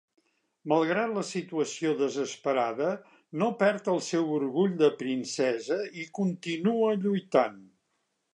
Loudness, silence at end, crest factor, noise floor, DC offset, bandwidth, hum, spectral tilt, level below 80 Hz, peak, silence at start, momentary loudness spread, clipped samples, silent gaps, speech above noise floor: -28 LUFS; 0.7 s; 18 dB; -77 dBFS; under 0.1%; 11 kHz; none; -5.5 dB/octave; -82 dBFS; -10 dBFS; 0.65 s; 7 LU; under 0.1%; none; 50 dB